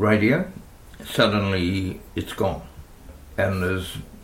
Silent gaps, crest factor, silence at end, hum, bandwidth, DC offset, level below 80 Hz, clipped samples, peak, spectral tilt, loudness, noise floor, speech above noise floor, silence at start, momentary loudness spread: none; 20 dB; 0 s; none; 16.5 kHz; under 0.1%; -44 dBFS; under 0.1%; -4 dBFS; -6 dB/octave; -24 LUFS; -43 dBFS; 21 dB; 0 s; 16 LU